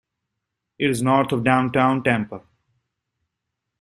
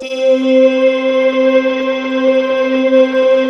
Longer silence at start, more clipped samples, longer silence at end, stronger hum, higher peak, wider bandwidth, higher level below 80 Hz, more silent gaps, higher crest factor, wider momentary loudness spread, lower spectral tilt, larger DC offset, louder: first, 0.8 s vs 0 s; neither; first, 1.4 s vs 0 s; neither; second, -4 dBFS vs 0 dBFS; first, 13 kHz vs 6.4 kHz; about the same, -58 dBFS vs -60 dBFS; neither; first, 20 dB vs 12 dB; first, 8 LU vs 4 LU; first, -6 dB/octave vs -4 dB/octave; neither; second, -20 LUFS vs -12 LUFS